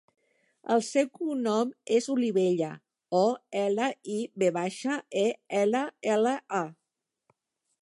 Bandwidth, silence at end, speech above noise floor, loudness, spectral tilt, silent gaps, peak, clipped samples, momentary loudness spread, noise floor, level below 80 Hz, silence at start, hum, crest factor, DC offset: 11.5 kHz; 1.1 s; 58 dB; -28 LUFS; -5 dB/octave; none; -12 dBFS; under 0.1%; 7 LU; -85 dBFS; -82 dBFS; 0.65 s; none; 16 dB; under 0.1%